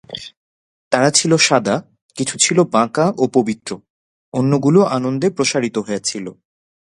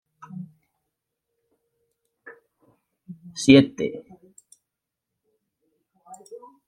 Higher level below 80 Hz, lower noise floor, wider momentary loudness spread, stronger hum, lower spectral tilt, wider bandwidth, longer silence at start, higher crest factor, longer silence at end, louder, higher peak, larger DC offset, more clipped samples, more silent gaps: about the same, -60 dBFS vs -62 dBFS; first, under -90 dBFS vs -85 dBFS; second, 16 LU vs 29 LU; neither; second, -4 dB/octave vs -5.5 dB/octave; about the same, 11.5 kHz vs 11.5 kHz; second, 0.1 s vs 0.4 s; second, 18 dB vs 26 dB; first, 0.55 s vs 0.3 s; first, -16 LUFS vs -19 LUFS; about the same, 0 dBFS vs -2 dBFS; neither; neither; first, 0.37-0.91 s, 2.02-2.09 s, 3.90-4.32 s vs none